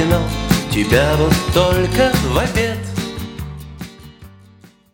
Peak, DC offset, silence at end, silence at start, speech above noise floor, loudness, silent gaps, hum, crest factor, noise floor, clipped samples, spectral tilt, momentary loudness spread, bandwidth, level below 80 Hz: 0 dBFS; under 0.1%; 0.65 s; 0 s; 32 dB; -16 LUFS; none; none; 16 dB; -46 dBFS; under 0.1%; -5.5 dB/octave; 17 LU; 18.5 kHz; -28 dBFS